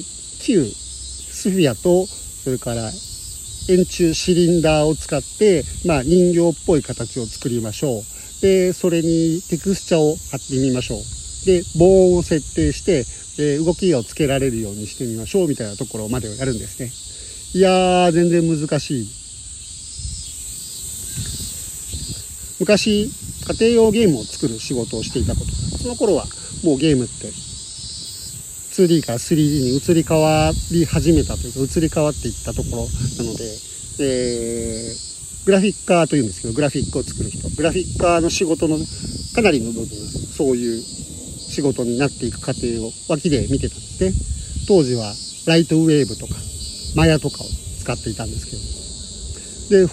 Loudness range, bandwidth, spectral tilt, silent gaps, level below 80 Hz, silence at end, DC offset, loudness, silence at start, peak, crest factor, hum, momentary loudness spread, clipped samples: 5 LU; 15.5 kHz; -5 dB/octave; none; -36 dBFS; 0 s; under 0.1%; -19 LUFS; 0 s; -2 dBFS; 18 dB; none; 14 LU; under 0.1%